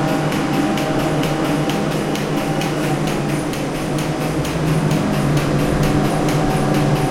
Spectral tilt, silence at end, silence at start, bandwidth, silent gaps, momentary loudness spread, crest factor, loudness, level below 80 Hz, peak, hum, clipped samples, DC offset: -6 dB/octave; 0 s; 0 s; 16.5 kHz; none; 4 LU; 14 dB; -18 LUFS; -34 dBFS; -4 dBFS; none; under 0.1%; under 0.1%